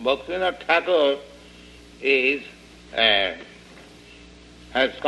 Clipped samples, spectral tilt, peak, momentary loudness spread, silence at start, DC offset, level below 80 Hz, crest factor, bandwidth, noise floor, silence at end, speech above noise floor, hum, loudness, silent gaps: under 0.1%; -3.5 dB/octave; -6 dBFS; 13 LU; 0 s; under 0.1%; -52 dBFS; 20 dB; 11.5 kHz; -46 dBFS; 0 s; 25 dB; none; -21 LUFS; none